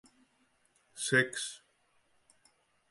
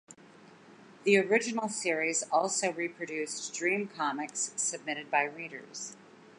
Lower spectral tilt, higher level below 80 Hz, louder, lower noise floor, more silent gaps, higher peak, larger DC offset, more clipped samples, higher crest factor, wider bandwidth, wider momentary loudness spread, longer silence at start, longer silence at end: about the same, -3 dB/octave vs -2.5 dB/octave; first, -82 dBFS vs -88 dBFS; about the same, -31 LUFS vs -31 LUFS; first, -72 dBFS vs -56 dBFS; neither; about the same, -14 dBFS vs -12 dBFS; neither; neither; about the same, 24 dB vs 22 dB; about the same, 11.5 kHz vs 11.5 kHz; first, 24 LU vs 14 LU; first, 0.95 s vs 0.1 s; first, 1.35 s vs 0.1 s